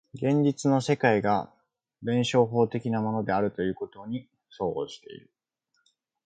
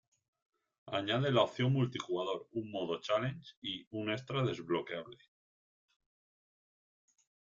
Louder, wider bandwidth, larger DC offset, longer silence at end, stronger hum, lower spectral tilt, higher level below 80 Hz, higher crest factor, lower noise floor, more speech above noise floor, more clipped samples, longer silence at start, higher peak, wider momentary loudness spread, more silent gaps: first, -27 LUFS vs -36 LUFS; first, 9.2 kHz vs 7.4 kHz; neither; second, 1.1 s vs 2.45 s; neither; about the same, -6.5 dB/octave vs -6.5 dB/octave; first, -62 dBFS vs -74 dBFS; about the same, 20 dB vs 22 dB; second, -76 dBFS vs under -90 dBFS; second, 50 dB vs over 55 dB; neither; second, 0.15 s vs 0.85 s; first, -8 dBFS vs -16 dBFS; first, 14 LU vs 11 LU; second, none vs 3.57-3.62 s, 3.87-3.91 s